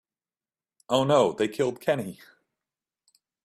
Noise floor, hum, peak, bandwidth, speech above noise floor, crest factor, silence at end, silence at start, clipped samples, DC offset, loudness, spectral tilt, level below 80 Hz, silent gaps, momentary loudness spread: under -90 dBFS; none; -8 dBFS; 15.5 kHz; over 65 dB; 20 dB; 1.3 s; 0.9 s; under 0.1%; under 0.1%; -25 LUFS; -5.5 dB/octave; -68 dBFS; none; 8 LU